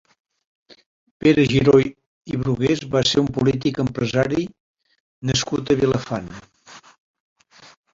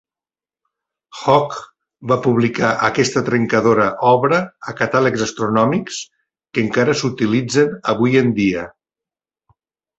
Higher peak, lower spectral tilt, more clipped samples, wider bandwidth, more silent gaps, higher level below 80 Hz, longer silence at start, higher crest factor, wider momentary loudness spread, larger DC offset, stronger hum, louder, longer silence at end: about the same, -2 dBFS vs 0 dBFS; about the same, -5.5 dB/octave vs -5.5 dB/octave; neither; about the same, 7.8 kHz vs 8.2 kHz; first, 2.06-2.21 s, 4.60-4.75 s, 5.00-5.22 s vs none; first, -48 dBFS vs -54 dBFS; about the same, 1.25 s vs 1.15 s; about the same, 20 dB vs 18 dB; about the same, 14 LU vs 12 LU; neither; neither; second, -20 LUFS vs -17 LUFS; second, 1.15 s vs 1.3 s